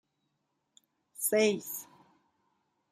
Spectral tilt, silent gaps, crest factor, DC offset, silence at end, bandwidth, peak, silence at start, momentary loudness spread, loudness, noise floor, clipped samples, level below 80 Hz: -3 dB/octave; none; 20 dB; under 0.1%; 1.1 s; 15.5 kHz; -16 dBFS; 1.2 s; 16 LU; -30 LUFS; -81 dBFS; under 0.1%; -84 dBFS